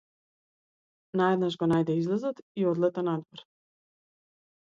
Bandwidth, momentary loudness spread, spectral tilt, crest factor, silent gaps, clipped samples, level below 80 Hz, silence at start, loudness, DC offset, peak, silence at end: 7.6 kHz; 8 LU; -8 dB/octave; 20 dB; 2.42-2.55 s; under 0.1%; -70 dBFS; 1.15 s; -28 LUFS; under 0.1%; -12 dBFS; 1.35 s